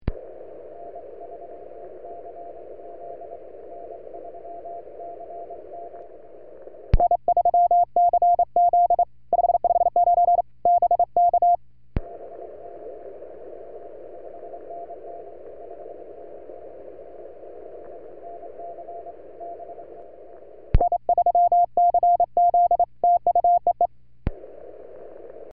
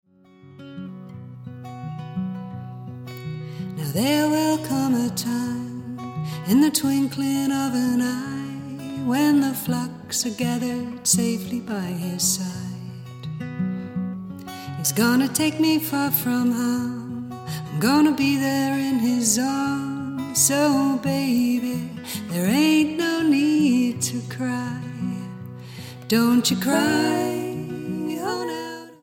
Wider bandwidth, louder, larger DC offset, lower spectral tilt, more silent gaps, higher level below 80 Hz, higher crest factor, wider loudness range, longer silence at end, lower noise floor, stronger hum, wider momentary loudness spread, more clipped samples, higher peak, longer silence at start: second, 3 kHz vs 17 kHz; first, -20 LUFS vs -23 LUFS; first, 0.6% vs under 0.1%; first, -8.5 dB/octave vs -4 dB/octave; neither; first, -38 dBFS vs -64 dBFS; about the same, 18 dB vs 20 dB; first, 21 LU vs 5 LU; first, 0.5 s vs 0.1 s; second, -45 dBFS vs -50 dBFS; first, 60 Hz at -60 dBFS vs none; first, 23 LU vs 16 LU; neither; about the same, -6 dBFS vs -4 dBFS; second, 0.05 s vs 0.45 s